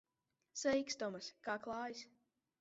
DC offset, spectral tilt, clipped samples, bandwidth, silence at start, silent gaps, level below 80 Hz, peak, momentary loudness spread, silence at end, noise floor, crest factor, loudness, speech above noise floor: under 0.1%; -2 dB/octave; under 0.1%; 7.6 kHz; 0.55 s; none; -78 dBFS; -26 dBFS; 14 LU; 0.55 s; -88 dBFS; 18 dB; -42 LUFS; 46 dB